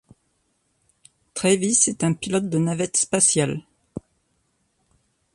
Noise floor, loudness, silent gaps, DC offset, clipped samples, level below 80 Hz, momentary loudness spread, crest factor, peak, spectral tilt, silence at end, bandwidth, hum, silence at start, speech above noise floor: -69 dBFS; -20 LUFS; none; under 0.1%; under 0.1%; -60 dBFS; 22 LU; 20 dB; -4 dBFS; -4 dB/octave; 1.35 s; 11.5 kHz; none; 1.35 s; 48 dB